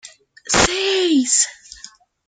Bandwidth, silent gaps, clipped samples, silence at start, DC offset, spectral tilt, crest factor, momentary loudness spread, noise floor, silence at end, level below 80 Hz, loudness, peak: 9.8 kHz; none; under 0.1%; 0.05 s; under 0.1%; -1.5 dB/octave; 20 dB; 23 LU; -44 dBFS; 0.4 s; -42 dBFS; -16 LUFS; 0 dBFS